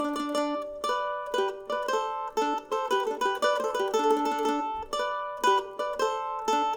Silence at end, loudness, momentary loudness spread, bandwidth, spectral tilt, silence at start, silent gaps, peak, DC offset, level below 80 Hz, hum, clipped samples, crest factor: 0 s; -28 LUFS; 6 LU; over 20 kHz; -2 dB/octave; 0 s; none; -10 dBFS; under 0.1%; -62 dBFS; none; under 0.1%; 18 dB